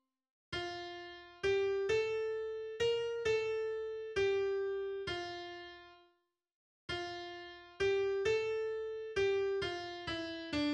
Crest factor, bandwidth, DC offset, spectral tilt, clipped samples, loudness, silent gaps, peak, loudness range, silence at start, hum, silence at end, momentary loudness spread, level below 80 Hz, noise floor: 14 dB; 9.4 kHz; under 0.1%; -4.5 dB/octave; under 0.1%; -37 LUFS; 6.54-6.88 s; -22 dBFS; 5 LU; 0.5 s; none; 0 s; 13 LU; -64 dBFS; -77 dBFS